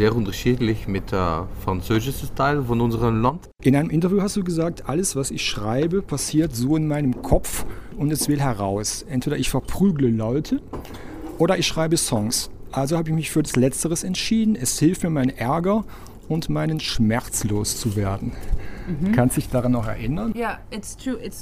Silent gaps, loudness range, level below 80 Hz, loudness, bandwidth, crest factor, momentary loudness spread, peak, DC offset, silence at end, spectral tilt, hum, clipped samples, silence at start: none; 2 LU; -36 dBFS; -22 LUFS; 16 kHz; 18 dB; 9 LU; -4 dBFS; under 0.1%; 0 s; -5 dB/octave; none; under 0.1%; 0 s